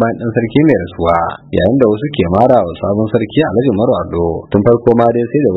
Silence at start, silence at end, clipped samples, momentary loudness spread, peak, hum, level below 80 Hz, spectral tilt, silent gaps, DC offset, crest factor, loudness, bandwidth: 0 s; 0 s; 0.3%; 6 LU; 0 dBFS; none; -38 dBFS; -10 dB/octave; none; under 0.1%; 12 dB; -13 LUFS; 4.9 kHz